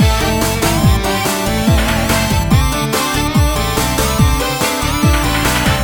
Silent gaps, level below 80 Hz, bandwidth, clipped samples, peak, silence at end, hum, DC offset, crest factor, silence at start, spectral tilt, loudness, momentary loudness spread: none; -20 dBFS; over 20 kHz; under 0.1%; 0 dBFS; 0 s; none; under 0.1%; 14 dB; 0 s; -4.5 dB/octave; -14 LUFS; 2 LU